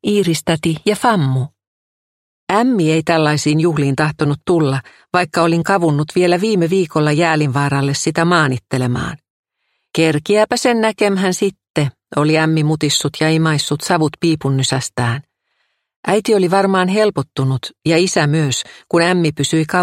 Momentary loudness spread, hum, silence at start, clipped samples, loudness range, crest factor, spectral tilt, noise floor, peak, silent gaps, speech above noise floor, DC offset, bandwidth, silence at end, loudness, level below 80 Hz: 6 LU; none; 0.05 s; under 0.1%; 2 LU; 16 dB; -5 dB/octave; -70 dBFS; 0 dBFS; 1.67-2.47 s, 9.30-9.44 s, 11.70-11.74 s, 15.96-16.03 s; 55 dB; under 0.1%; 15.5 kHz; 0 s; -16 LUFS; -52 dBFS